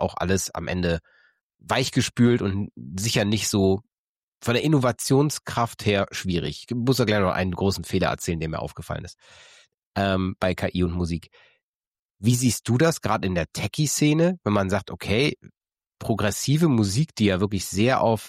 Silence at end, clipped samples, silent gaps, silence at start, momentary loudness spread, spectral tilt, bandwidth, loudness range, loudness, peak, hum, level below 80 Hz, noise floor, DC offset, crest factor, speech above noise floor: 0 s; under 0.1%; 1.43-1.50 s, 3.92-4.41 s, 9.74-9.93 s, 11.63-11.81 s, 11.87-11.92 s, 11.99-12.09 s; 0 s; 9 LU; -5 dB/octave; 16 kHz; 4 LU; -24 LUFS; -8 dBFS; none; -48 dBFS; under -90 dBFS; under 0.1%; 16 dB; over 67 dB